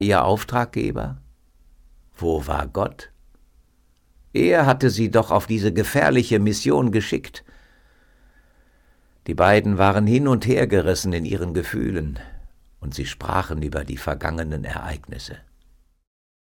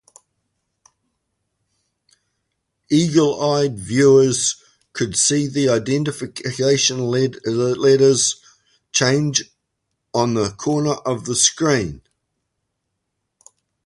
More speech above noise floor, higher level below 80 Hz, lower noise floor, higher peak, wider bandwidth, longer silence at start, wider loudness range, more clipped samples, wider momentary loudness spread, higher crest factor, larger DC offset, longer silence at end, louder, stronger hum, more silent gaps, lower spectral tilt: second, 39 dB vs 59 dB; first, -40 dBFS vs -54 dBFS; second, -60 dBFS vs -76 dBFS; second, -4 dBFS vs 0 dBFS; first, 18 kHz vs 11.5 kHz; second, 0 s vs 2.9 s; first, 9 LU vs 5 LU; neither; first, 16 LU vs 11 LU; about the same, 18 dB vs 20 dB; neither; second, 1.1 s vs 1.9 s; second, -21 LUFS vs -18 LUFS; neither; neither; first, -6 dB/octave vs -4 dB/octave